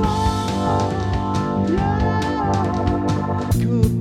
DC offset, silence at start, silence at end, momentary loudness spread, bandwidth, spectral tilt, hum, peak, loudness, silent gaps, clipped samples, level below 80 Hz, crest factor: under 0.1%; 0 s; 0 s; 3 LU; 15.5 kHz; -7 dB/octave; none; -4 dBFS; -20 LUFS; none; under 0.1%; -30 dBFS; 16 dB